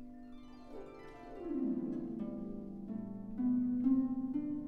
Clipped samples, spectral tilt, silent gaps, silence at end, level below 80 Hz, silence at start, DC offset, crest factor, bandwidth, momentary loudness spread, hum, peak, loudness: under 0.1%; -10 dB/octave; none; 0 s; -60 dBFS; 0 s; under 0.1%; 16 dB; 4.2 kHz; 20 LU; none; -22 dBFS; -37 LUFS